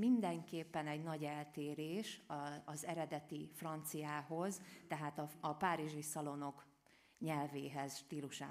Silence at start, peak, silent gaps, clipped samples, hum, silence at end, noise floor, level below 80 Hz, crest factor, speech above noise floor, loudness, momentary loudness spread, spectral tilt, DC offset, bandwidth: 0 s; -24 dBFS; none; under 0.1%; none; 0 s; -71 dBFS; -86 dBFS; 20 dB; 28 dB; -45 LUFS; 8 LU; -5 dB/octave; under 0.1%; 15.5 kHz